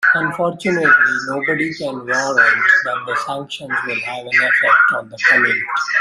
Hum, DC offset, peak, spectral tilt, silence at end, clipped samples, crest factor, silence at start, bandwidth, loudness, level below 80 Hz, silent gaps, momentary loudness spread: none; under 0.1%; 0 dBFS; -3.5 dB/octave; 0 s; under 0.1%; 16 dB; 0 s; 12.5 kHz; -15 LUFS; -64 dBFS; none; 10 LU